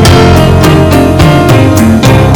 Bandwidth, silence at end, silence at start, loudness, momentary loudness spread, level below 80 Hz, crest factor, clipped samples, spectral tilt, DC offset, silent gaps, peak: over 20 kHz; 0 s; 0 s; -4 LUFS; 1 LU; -18 dBFS; 4 dB; 30%; -6 dB/octave; under 0.1%; none; 0 dBFS